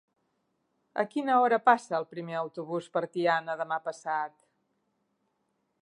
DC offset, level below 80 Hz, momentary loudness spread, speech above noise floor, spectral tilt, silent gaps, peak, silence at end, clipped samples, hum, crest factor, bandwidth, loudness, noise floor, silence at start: under 0.1%; -88 dBFS; 12 LU; 49 dB; -5.5 dB/octave; none; -8 dBFS; 1.55 s; under 0.1%; none; 22 dB; 11 kHz; -29 LUFS; -77 dBFS; 0.95 s